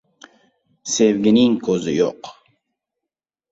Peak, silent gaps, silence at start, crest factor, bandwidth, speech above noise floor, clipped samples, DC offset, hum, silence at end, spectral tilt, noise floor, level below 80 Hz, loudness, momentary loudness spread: -4 dBFS; none; 0.85 s; 18 dB; 8 kHz; 68 dB; under 0.1%; under 0.1%; none; 1.2 s; -4.5 dB/octave; -85 dBFS; -60 dBFS; -17 LUFS; 21 LU